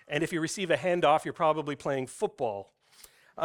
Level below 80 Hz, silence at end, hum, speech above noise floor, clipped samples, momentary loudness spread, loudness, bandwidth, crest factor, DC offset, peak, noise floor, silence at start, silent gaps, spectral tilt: -68 dBFS; 0 s; none; 29 dB; under 0.1%; 9 LU; -29 LUFS; 18 kHz; 18 dB; under 0.1%; -12 dBFS; -57 dBFS; 0.1 s; none; -4.5 dB/octave